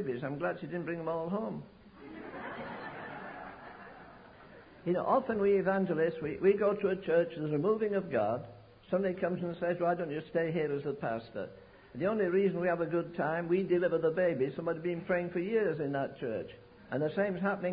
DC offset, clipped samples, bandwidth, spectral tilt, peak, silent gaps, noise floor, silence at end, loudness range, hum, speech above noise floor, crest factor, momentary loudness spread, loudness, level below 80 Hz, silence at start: under 0.1%; under 0.1%; 5 kHz; -6.5 dB/octave; -16 dBFS; none; -54 dBFS; 0 s; 10 LU; none; 22 dB; 18 dB; 16 LU; -33 LUFS; -66 dBFS; 0 s